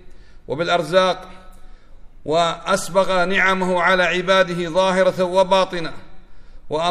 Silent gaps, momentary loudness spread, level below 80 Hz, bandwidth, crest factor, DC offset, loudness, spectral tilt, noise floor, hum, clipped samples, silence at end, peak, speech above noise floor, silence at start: none; 11 LU; -42 dBFS; 13.5 kHz; 18 dB; under 0.1%; -18 LUFS; -4 dB/octave; -39 dBFS; none; under 0.1%; 0 s; -2 dBFS; 21 dB; 0.05 s